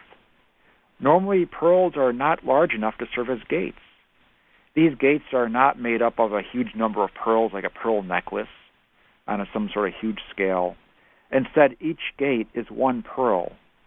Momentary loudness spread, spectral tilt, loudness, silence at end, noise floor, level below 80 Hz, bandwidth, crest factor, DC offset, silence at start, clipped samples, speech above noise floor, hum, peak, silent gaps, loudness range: 10 LU; -9.5 dB/octave; -23 LUFS; 0.4 s; -61 dBFS; -56 dBFS; 3.9 kHz; 20 dB; under 0.1%; 1 s; under 0.1%; 39 dB; none; -4 dBFS; none; 5 LU